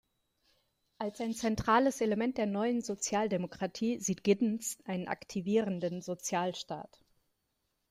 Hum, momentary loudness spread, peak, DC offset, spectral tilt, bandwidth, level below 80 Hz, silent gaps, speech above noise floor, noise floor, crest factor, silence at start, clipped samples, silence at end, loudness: none; 10 LU; -14 dBFS; under 0.1%; -4.5 dB/octave; 15 kHz; -64 dBFS; none; 48 dB; -81 dBFS; 20 dB; 1 s; under 0.1%; 1.05 s; -33 LUFS